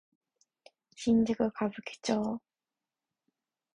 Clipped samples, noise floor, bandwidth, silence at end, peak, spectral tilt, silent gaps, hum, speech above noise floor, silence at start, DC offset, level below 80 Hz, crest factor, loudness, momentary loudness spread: under 0.1%; under -90 dBFS; 10.5 kHz; 1.4 s; -14 dBFS; -5.5 dB/octave; none; none; over 60 dB; 1 s; under 0.1%; -66 dBFS; 20 dB; -31 LUFS; 10 LU